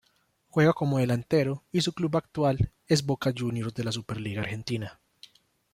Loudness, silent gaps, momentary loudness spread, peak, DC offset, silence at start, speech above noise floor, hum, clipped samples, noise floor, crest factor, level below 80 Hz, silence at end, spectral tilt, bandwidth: -28 LUFS; none; 9 LU; -10 dBFS; under 0.1%; 0.55 s; 42 dB; none; under 0.1%; -69 dBFS; 20 dB; -52 dBFS; 0.8 s; -6 dB/octave; 15.5 kHz